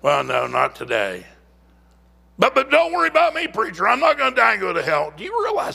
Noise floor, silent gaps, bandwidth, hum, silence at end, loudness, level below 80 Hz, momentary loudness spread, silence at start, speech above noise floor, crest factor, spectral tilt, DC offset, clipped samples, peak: -53 dBFS; none; 15.5 kHz; none; 0 s; -19 LUFS; -54 dBFS; 7 LU; 0.05 s; 34 dB; 20 dB; -4 dB/octave; under 0.1%; under 0.1%; 0 dBFS